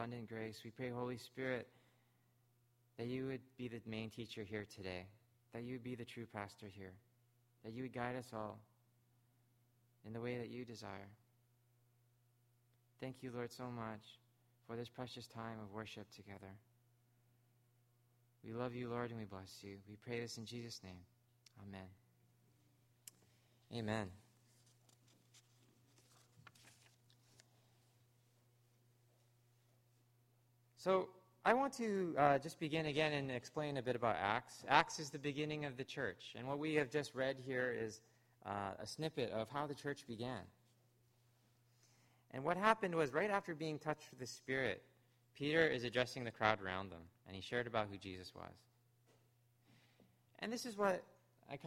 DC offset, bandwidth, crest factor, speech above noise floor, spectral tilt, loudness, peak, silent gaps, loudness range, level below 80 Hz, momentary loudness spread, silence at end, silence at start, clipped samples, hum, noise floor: under 0.1%; 16 kHz; 32 dB; 34 dB; -5 dB/octave; -43 LUFS; -14 dBFS; none; 14 LU; -78 dBFS; 19 LU; 0 s; 0 s; under 0.1%; none; -77 dBFS